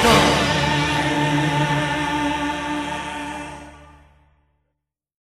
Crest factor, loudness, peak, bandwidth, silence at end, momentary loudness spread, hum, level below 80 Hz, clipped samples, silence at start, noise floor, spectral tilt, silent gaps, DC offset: 20 dB; -20 LUFS; -2 dBFS; 14 kHz; 1.5 s; 14 LU; none; -40 dBFS; under 0.1%; 0 s; -79 dBFS; -4.5 dB/octave; none; under 0.1%